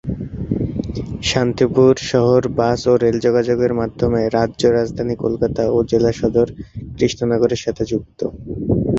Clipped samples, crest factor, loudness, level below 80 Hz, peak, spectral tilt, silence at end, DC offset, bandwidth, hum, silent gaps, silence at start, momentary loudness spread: under 0.1%; 16 dB; -18 LUFS; -38 dBFS; -2 dBFS; -6.5 dB/octave; 0 s; under 0.1%; 8 kHz; none; none; 0.05 s; 11 LU